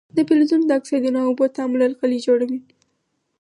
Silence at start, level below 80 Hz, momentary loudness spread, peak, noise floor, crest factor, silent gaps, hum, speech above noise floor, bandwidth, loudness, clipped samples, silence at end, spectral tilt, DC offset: 0.15 s; -74 dBFS; 5 LU; -4 dBFS; -71 dBFS; 14 dB; none; none; 53 dB; 11 kHz; -19 LUFS; under 0.1%; 0.8 s; -5.5 dB/octave; under 0.1%